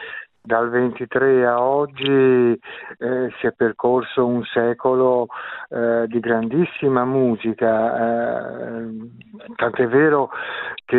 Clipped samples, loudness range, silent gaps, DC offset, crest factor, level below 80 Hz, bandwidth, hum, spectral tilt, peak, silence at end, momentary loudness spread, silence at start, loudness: under 0.1%; 2 LU; none; under 0.1%; 16 dB; -62 dBFS; 4.1 kHz; none; -10.5 dB/octave; -4 dBFS; 0 s; 13 LU; 0 s; -19 LUFS